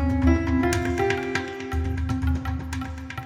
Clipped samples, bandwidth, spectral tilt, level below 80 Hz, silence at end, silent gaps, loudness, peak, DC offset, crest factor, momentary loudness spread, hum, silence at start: under 0.1%; 16 kHz; -6.5 dB/octave; -30 dBFS; 0 s; none; -25 LUFS; -8 dBFS; under 0.1%; 16 dB; 10 LU; none; 0 s